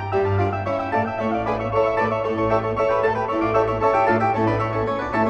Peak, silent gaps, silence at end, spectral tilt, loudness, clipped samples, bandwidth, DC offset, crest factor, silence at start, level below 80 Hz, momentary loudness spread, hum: -6 dBFS; none; 0 s; -8 dB/octave; -21 LUFS; under 0.1%; 8.4 kHz; under 0.1%; 16 dB; 0 s; -44 dBFS; 4 LU; none